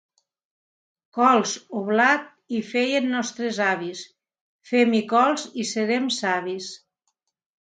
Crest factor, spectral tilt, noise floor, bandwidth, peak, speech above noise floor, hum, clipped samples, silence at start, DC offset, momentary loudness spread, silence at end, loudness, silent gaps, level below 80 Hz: 20 dB; -3.5 dB/octave; -76 dBFS; 9.4 kHz; -4 dBFS; 54 dB; none; under 0.1%; 1.15 s; under 0.1%; 12 LU; 0.9 s; -22 LUFS; 4.41-4.59 s; -76 dBFS